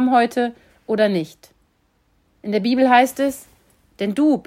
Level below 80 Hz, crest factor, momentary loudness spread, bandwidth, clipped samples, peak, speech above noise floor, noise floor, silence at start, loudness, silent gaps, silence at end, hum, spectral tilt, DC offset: -62 dBFS; 18 dB; 14 LU; 16 kHz; under 0.1%; -2 dBFS; 45 dB; -63 dBFS; 0 s; -19 LUFS; none; 0.05 s; none; -5.5 dB/octave; under 0.1%